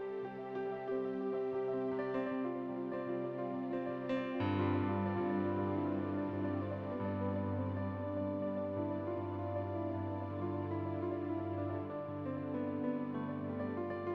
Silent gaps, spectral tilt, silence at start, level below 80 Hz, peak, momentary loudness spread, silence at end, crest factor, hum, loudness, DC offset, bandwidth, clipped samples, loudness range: none; -10 dB/octave; 0 s; -74 dBFS; -22 dBFS; 5 LU; 0 s; 16 dB; none; -39 LUFS; under 0.1%; 5.4 kHz; under 0.1%; 3 LU